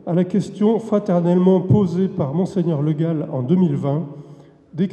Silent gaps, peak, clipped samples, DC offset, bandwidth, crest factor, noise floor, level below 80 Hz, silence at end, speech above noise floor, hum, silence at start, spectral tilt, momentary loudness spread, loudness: none; -4 dBFS; under 0.1%; under 0.1%; 8.6 kHz; 16 dB; -44 dBFS; -54 dBFS; 0 s; 26 dB; none; 0.05 s; -9.5 dB/octave; 9 LU; -19 LUFS